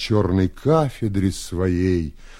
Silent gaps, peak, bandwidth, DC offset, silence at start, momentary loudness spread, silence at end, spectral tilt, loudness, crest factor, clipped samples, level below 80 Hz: none; -4 dBFS; 14.5 kHz; under 0.1%; 0 s; 5 LU; 0 s; -7 dB/octave; -21 LUFS; 18 dB; under 0.1%; -38 dBFS